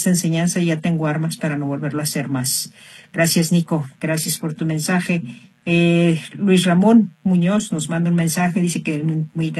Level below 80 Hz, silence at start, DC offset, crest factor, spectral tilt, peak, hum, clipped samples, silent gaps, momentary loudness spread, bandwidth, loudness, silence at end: -60 dBFS; 0 s; under 0.1%; 16 dB; -5 dB/octave; -2 dBFS; none; under 0.1%; none; 8 LU; 13 kHz; -19 LUFS; 0 s